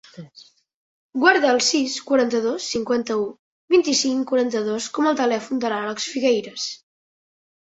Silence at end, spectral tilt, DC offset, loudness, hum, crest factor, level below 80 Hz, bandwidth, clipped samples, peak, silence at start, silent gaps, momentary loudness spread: 0.9 s; -2.5 dB/octave; under 0.1%; -21 LUFS; none; 20 dB; -66 dBFS; 8.2 kHz; under 0.1%; -2 dBFS; 0.15 s; 0.74-1.09 s, 3.39-3.68 s; 12 LU